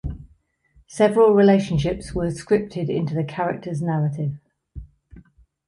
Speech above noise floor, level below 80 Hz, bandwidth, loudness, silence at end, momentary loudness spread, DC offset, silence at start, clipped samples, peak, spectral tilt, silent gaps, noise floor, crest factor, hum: 40 dB; -42 dBFS; 11.5 kHz; -21 LUFS; 0.5 s; 15 LU; under 0.1%; 0.05 s; under 0.1%; -6 dBFS; -7.5 dB/octave; none; -60 dBFS; 16 dB; none